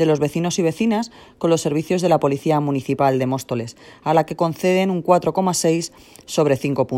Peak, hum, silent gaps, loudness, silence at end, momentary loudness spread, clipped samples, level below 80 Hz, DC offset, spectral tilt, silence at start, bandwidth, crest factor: -2 dBFS; none; none; -20 LUFS; 0 s; 7 LU; under 0.1%; -56 dBFS; under 0.1%; -5.5 dB/octave; 0 s; 16.5 kHz; 18 dB